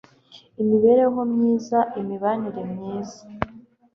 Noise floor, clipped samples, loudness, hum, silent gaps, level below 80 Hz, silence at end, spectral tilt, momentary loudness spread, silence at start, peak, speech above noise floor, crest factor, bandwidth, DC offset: -51 dBFS; under 0.1%; -22 LUFS; none; none; -56 dBFS; 0.35 s; -7.5 dB/octave; 15 LU; 0.35 s; -2 dBFS; 30 dB; 20 dB; 7 kHz; under 0.1%